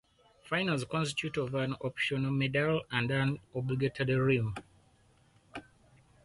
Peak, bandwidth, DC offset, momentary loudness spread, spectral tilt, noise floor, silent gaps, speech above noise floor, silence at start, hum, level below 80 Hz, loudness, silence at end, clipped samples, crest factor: -16 dBFS; 11.5 kHz; under 0.1%; 11 LU; -6 dB/octave; -65 dBFS; none; 34 dB; 0.45 s; none; -60 dBFS; -32 LUFS; 0.65 s; under 0.1%; 18 dB